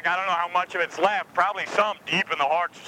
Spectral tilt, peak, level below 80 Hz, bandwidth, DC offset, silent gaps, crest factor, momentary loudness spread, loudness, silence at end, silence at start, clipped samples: -3 dB/octave; -6 dBFS; -74 dBFS; 16.5 kHz; under 0.1%; none; 18 dB; 2 LU; -24 LUFS; 0 s; 0 s; under 0.1%